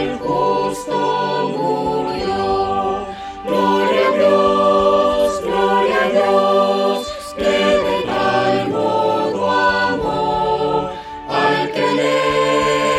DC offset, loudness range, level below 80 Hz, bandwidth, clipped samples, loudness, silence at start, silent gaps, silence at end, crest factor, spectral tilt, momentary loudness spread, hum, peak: under 0.1%; 4 LU; -44 dBFS; 14 kHz; under 0.1%; -17 LUFS; 0 s; none; 0 s; 14 dB; -5 dB/octave; 7 LU; none; -2 dBFS